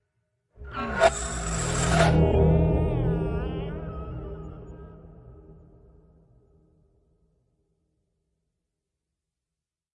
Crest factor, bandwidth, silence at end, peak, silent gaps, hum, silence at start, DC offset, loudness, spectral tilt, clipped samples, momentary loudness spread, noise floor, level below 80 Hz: 24 dB; 11.5 kHz; 4.45 s; -4 dBFS; none; none; 0.6 s; under 0.1%; -25 LUFS; -5.5 dB/octave; under 0.1%; 21 LU; -89 dBFS; -36 dBFS